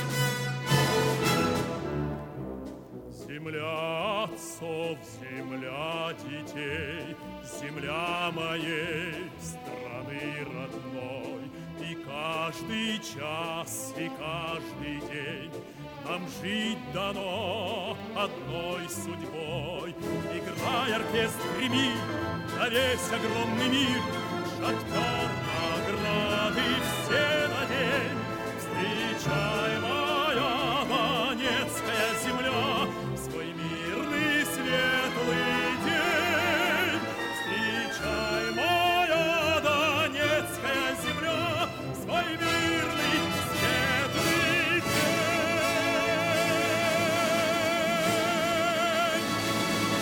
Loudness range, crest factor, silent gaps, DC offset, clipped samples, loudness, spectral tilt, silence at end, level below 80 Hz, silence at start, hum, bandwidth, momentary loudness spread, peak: 9 LU; 18 dB; none; under 0.1%; under 0.1%; -28 LUFS; -4 dB/octave; 0 s; -56 dBFS; 0 s; none; 18 kHz; 12 LU; -12 dBFS